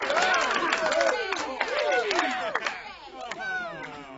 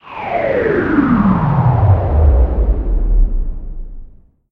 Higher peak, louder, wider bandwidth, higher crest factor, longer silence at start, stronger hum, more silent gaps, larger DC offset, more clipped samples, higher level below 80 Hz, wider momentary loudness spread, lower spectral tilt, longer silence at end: second, -6 dBFS vs 0 dBFS; second, -26 LUFS vs -15 LUFS; first, 8 kHz vs 4.4 kHz; first, 22 dB vs 12 dB; about the same, 0 s vs 0.05 s; neither; neither; neither; neither; second, -62 dBFS vs -16 dBFS; about the same, 15 LU vs 14 LU; second, -1.5 dB/octave vs -11 dB/octave; second, 0 s vs 0.45 s